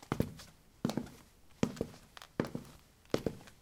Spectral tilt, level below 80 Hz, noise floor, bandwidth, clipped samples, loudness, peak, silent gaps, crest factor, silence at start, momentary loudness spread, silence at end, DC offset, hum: -6 dB/octave; -58 dBFS; -59 dBFS; 17.5 kHz; under 0.1%; -40 LUFS; -12 dBFS; none; 28 dB; 0 s; 18 LU; 0.05 s; under 0.1%; none